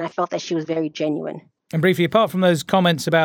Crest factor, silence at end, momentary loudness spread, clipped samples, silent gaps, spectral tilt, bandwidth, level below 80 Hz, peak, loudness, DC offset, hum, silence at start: 18 dB; 0 s; 11 LU; under 0.1%; none; -5.5 dB/octave; 17.5 kHz; -64 dBFS; -2 dBFS; -20 LUFS; under 0.1%; none; 0 s